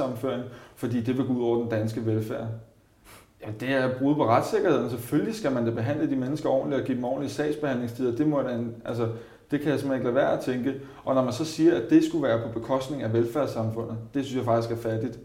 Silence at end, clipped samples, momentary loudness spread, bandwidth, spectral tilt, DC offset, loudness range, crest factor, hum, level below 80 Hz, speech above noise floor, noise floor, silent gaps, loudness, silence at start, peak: 0 s; under 0.1%; 9 LU; 16 kHz; -7 dB/octave; under 0.1%; 3 LU; 20 dB; none; -60 dBFS; 27 dB; -53 dBFS; none; -27 LUFS; 0 s; -8 dBFS